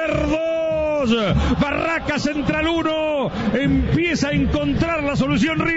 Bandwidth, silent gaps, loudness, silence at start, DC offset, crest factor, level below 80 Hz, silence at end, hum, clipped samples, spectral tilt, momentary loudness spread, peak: 8 kHz; none; -20 LUFS; 0 s; under 0.1%; 14 dB; -32 dBFS; 0 s; none; under 0.1%; -6 dB/octave; 3 LU; -6 dBFS